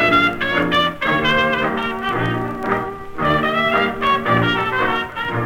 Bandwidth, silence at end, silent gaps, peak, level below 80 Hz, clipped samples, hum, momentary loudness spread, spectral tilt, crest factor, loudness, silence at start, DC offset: 18 kHz; 0 s; none; -4 dBFS; -42 dBFS; under 0.1%; none; 6 LU; -6 dB/octave; 14 dB; -18 LUFS; 0 s; under 0.1%